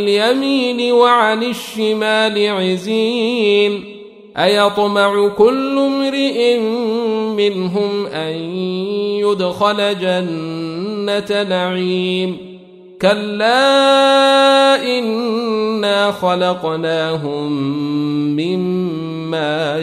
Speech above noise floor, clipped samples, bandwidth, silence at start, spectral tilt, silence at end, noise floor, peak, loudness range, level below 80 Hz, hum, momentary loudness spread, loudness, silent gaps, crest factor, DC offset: 23 dB; under 0.1%; 14.5 kHz; 0 s; -5 dB/octave; 0 s; -38 dBFS; 0 dBFS; 5 LU; -60 dBFS; none; 10 LU; -15 LUFS; none; 14 dB; under 0.1%